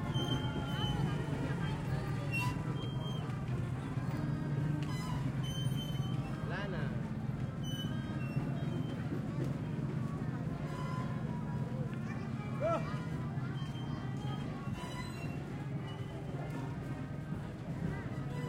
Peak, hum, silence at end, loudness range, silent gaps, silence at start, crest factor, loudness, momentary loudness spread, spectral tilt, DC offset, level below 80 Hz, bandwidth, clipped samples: -22 dBFS; none; 0 s; 4 LU; none; 0 s; 16 dB; -38 LUFS; 6 LU; -7 dB/octave; under 0.1%; -52 dBFS; 16 kHz; under 0.1%